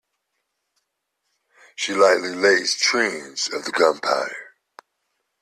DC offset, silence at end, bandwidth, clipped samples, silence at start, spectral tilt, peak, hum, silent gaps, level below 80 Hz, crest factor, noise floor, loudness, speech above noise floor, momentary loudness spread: under 0.1%; 0.95 s; 14 kHz; under 0.1%; 1.8 s; -1.5 dB/octave; -2 dBFS; none; none; -70 dBFS; 20 dB; -77 dBFS; -20 LUFS; 56 dB; 11 LU